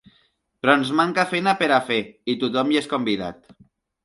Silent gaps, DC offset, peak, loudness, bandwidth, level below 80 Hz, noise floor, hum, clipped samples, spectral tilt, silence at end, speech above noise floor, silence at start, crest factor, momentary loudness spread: none; under 0.1%; -2 dBFS; -21 LUFS; 11.5 kHz; -62 dBFS; -64 dBFS; none; under 0.1%; -5 dB/octave; 0.7 s; 43 dB; 0.65 s; 20 dB; 7 LU